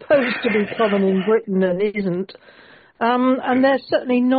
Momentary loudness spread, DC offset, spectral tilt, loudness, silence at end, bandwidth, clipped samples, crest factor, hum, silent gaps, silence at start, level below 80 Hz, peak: 6 LU; under 0.1%; -5 dB/octave; -19 LUFS; 0 s; 4.9 kHz; under 0.1%; 14 dB; none; none; 0 s; -62 dBFS; -4 dBFS